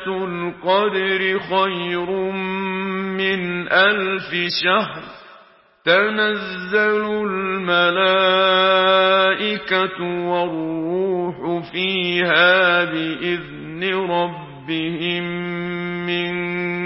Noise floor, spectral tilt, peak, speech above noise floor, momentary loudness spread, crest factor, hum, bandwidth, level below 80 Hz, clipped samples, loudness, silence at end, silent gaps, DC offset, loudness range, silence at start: -50 dBFS; -9 dB/octave; 0 dBFS; 31 dB; 11 LU; 20 dB; none; 5.8 kHz; -58 dBFS; under 0.1%; -19 LUFS; 0 s; none; under 0.1%; 5 LU; 0 s